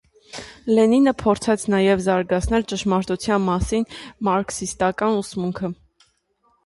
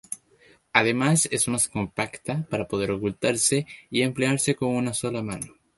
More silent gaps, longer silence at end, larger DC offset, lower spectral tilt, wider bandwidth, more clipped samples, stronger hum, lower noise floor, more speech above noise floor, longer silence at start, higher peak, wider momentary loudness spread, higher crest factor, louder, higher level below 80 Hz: neither; first, 0.9 s vs 0.3 s; neither; first, -5.5 dB/octave vs -4 dB/octave; about the same, 11.5 kHz vs 12 kHz; neither; neither; first, -65 dBFS vs -58 dBFS; first, 45 dB vs 33 dB; first, 0.35 s vs 0.1 s; about the same, -4 dBFS vs -2 dBFS; first, 13 LU vs 10 LU; second, 16 dB vs 24 dB; first, -21 LUFS vs -24 LUFS; first, -40 dBFS vs -56 dBFS